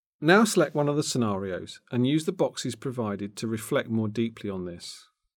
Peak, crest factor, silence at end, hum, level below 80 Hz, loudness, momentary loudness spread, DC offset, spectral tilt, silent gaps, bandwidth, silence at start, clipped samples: -6 dBFS; 20 dB; 0.35 s; none; -72 dBFS; -27 LUFS; 15 LU; under 0.1%; -5 dB/octave; none; 19 kHz; 0.2 s; under 0.1%